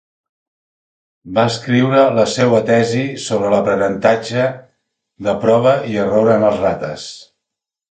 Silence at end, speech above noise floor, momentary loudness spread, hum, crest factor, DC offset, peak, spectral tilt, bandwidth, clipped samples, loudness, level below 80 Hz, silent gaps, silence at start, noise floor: 0.65 s; 68 dB; 9 LU; none; 16 dB; under 0.1%; 0 dBFS; -6 dB/octave; 9.4 kHz; under 0.1%; -15 LUFS; -52 dBFS; none; 1.25 s; -83 dBFS